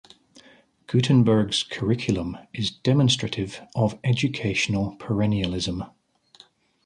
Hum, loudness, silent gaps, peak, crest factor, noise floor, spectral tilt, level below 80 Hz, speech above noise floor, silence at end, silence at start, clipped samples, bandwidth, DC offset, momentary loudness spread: none; -24 LUFS; none; -8 dBFS; 16 dB; -56 dBFS; -5.5 dB/octave; -48 dBFS; 33 dB; 1 s; 0.9 s; under 0.1%; 10.5 kHz; under 0.1%; 10 LU